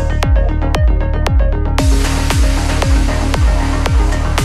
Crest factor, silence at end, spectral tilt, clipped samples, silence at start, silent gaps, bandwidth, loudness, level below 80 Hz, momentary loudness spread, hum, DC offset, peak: 12 dB; 0 s; -5.5 dB/octave; under 0.1%; 0 s; none; 13.5 kHz; -15 LUFS; -14 dBFS; 2 LU; none; under 0.1%; 0 dBFS